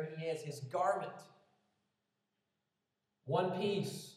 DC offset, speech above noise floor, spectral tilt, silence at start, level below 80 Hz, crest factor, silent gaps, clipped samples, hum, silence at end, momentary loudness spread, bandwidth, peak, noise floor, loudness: under 0.1%; 49 dB; -5.5 dB/octave; 0 s; under -90 dBFS; 18 dB; none; under 0.1%; none; 0 s; 13 LU; 14.5 kHz; -22 dBFS; -87 dBFS; -38 LUFS